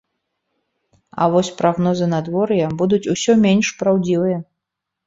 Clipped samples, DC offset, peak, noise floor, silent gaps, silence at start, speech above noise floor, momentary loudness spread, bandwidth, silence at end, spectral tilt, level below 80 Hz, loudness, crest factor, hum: under 0.1%; under 0.1%; -2 dBFS; -81 dBFS; none; 1.15 s; 64 dB; 6 LU; 7.8 kHz; 0.65 s; -6 dB/octave; -56 dBFS; -18 LUFS; 16 dB; none